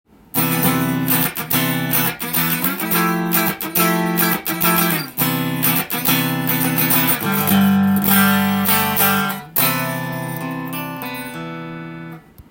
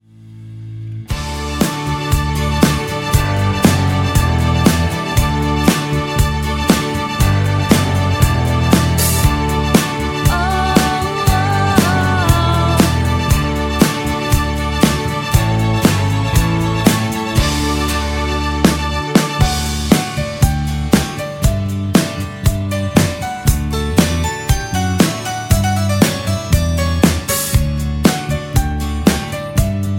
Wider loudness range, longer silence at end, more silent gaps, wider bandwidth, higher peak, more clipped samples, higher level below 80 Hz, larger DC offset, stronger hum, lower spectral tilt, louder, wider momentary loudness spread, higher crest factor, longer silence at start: about the same, 4 LU vs 2 LU; about the same, 0.1 s vs 0 s; neither; about the same, 17 kHz vs 17 kHz; about the same, 0 dBFS vs 0 dBFS; neither; second, -54 dBFS vs -22 dBFS; neither; neither; about the same, -4 dB/octave vs -5 dB/octave; about the same, -17 LUFS vs -15 LUFS; first, 12 LU vs 5 LU; about the same, 18 dB vs 14 dB; first, 0.35 s vs 0.2 s